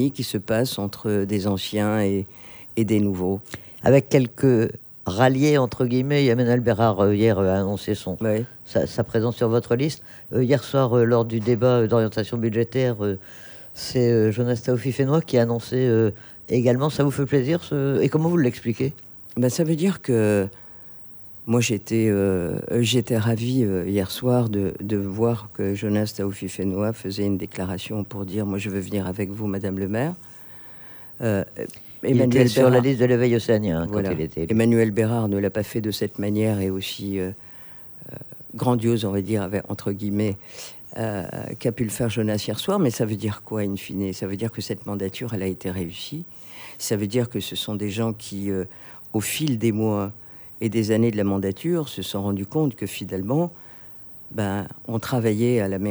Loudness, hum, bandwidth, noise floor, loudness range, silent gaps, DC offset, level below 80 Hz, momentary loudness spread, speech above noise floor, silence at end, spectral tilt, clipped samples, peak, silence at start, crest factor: -23 LUFS; none; over 20 kHz; -42 dBFS; 7 LU; none; under 0.1%; -56 dBFS; 14 LU; 20 dB; 0 s; -6.5 dB/octave; under 0.1%; -2 dBFS; 0 s; 20 dB